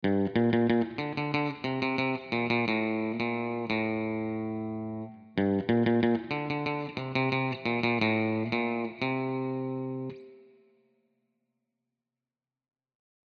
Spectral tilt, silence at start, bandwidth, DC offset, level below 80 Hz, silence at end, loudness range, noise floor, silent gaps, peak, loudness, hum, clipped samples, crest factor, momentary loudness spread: -8 dB/octave; 0 s; 6.6 kHz; under 0.1%; -70 dBFS; 2.95 s; 8 LU; under -90 dBFS; none; -12 dBFS; -30 LUFS; none; under 0.1%; 18 dB; 9 LU